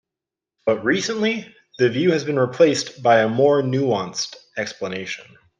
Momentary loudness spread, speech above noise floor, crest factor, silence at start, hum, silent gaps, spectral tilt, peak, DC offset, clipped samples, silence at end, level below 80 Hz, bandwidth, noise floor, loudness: 12 LU; 68 dB; 18 dB; 0.65 s; none; none; -5 dB/octave; -2 dBFS; under 0.1%; under 0.1%; 0.35 s; -66 dBFS; 9.8 kHz; -87 dBFS; -20 LUFS